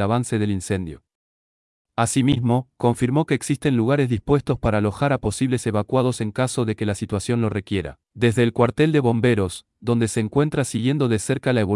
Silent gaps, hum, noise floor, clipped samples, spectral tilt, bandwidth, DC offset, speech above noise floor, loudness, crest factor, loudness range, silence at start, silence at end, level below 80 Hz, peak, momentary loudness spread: 1.15-1.85 s; none; under -90 dBFS; under 0.1%; -6 dB/octave; 12 kHz; under 0.1%; over 69 dB; -21 LUFS; 16 dB; 2 LU; 0 s; 0 s; -46 dBFS; -4 dBFS; 7 LU